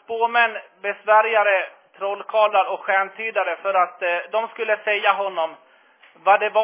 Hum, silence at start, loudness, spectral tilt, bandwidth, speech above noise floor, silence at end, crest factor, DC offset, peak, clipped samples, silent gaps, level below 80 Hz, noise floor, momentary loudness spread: none; 0.1 s; -20 LUFS; -5 dB/octave; 3.7 kHz; 33 dB; 0 s; 18 dB; under 0.1%; -4 dBFS; under 0.1%; none; -88 dBFS; -53 dBFS; 11 LU